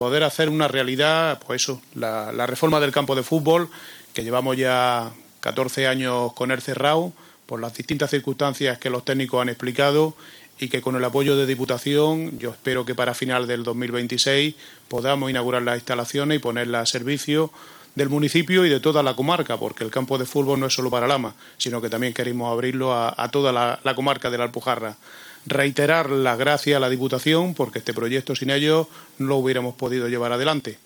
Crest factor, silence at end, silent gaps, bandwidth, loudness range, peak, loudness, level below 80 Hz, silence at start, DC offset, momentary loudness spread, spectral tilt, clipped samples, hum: 18 dB; 0.1 s; none; over 20 kHz; 2 LU; -4 dBFS; -22 LUFS; -66 dBFS; 0 s; under 0.1%; 8 LU; -4.5 dB/octave; under 0.1%; none